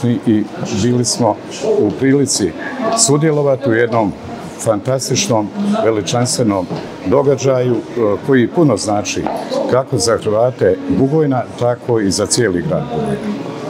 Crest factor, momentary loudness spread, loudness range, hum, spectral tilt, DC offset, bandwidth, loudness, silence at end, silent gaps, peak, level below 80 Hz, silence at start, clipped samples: 14 dB; 7 LU; 1 LU; none; -5 dB/octave; under 0.1%; 16 kHz; -15 LUFS; 0 s; none; 0 dBFS; -52 dBFS; 0 s; under 0.1%